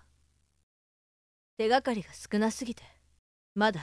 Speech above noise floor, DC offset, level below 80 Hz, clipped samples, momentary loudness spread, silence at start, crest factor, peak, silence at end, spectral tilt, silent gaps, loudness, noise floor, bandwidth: 41 dB; under 0.1%; -64 dBFS; under 0.1%; 14 LU; 1.6 s; 20 dB; -14 dBFS; 0 s; -4.5 dB/octave; 3.19-3.56 s; -31 LUFS; -70 dBFS; 11 kHz